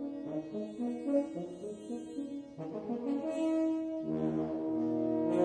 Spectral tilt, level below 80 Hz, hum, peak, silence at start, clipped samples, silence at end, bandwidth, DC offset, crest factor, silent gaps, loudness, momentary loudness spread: -8 dB/octave; -70 dBFS; none; -18 dBFS; 0 s; under 0.1%; 0 s; 9.8 kHz; under 0.1%; 16 dB; none; -36 LUFS; 10 LU